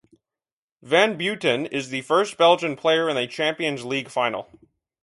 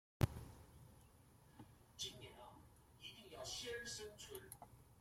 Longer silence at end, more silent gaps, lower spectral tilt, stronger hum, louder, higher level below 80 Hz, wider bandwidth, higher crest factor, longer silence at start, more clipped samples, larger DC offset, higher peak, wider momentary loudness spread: first, 0.6 s vs 0 s; neither; about the same, -4 dB/octave vs -4 dB/octave; neither; first, -22 LUFS vs -50 LUFS; second, -70 dBFS vs -64 dBFS; second, 11.5 kHz vs 16.5 kHz; second, 20 dB vs 30 dB; first, 0.85 s vs 0.2 s; neither; neither; first, -4 dBFS vs -22 dBFS; second, 9 LU vs 22 LU